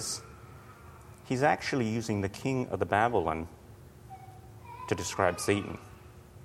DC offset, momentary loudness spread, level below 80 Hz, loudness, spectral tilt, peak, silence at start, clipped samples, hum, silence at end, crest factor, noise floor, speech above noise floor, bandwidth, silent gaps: under 0.1%; 24 LU; -56 dBFS; -30 LUFS; -5 dB/octave; -10 dBFS; 0 s; under 0.1%; none; 0 s; 24 dB; -51 dBFS; 21 dB; 16.5 kHz; none